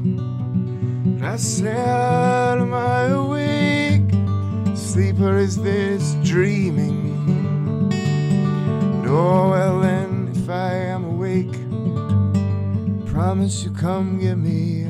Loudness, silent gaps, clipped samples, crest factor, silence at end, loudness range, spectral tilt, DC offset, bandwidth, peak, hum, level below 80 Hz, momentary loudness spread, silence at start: -20 LUFS; none; under 0.1%; 12 dB; 0 s; 3 LU; -7 dB/octave; under 0.1%; 12.5 kHz; -6 dBFS; none; -48 dBFS; 6 LU; 0 s